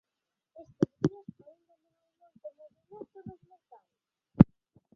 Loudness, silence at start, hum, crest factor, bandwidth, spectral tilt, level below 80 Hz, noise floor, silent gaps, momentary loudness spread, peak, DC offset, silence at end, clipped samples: -27 LUFS; 0.8 s; none; 32 dB; 6.8 kHz; -10 dB/octave; -52 dBFS; -88 dBFS; none; 26 LU; -2 dBFS; under 0.1%; 0.5 s; under 0.1%